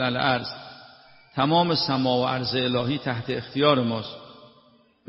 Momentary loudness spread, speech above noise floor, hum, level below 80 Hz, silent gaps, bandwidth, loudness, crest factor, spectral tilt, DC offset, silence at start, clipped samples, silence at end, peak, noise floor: 15 LU; 34 dB; none; -60 dBFS; none; 6 kHz; -24 LUFS; 20 dB; -3.5 dB/octave; under 0.1%; 0 s; under 0.1%; 0.65 s; -6 dBFS; -58 dBFS